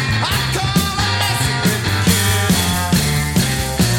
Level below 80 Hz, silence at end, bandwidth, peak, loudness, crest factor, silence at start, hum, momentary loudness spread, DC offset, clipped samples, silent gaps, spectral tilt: -30 dBFS; 0 s; 17 kHz; -2 dBFS; -16 LUFS; 14 dB; 0 s; none; 2 LU; 0.4%; under 0.1%; none; -4 dB/octave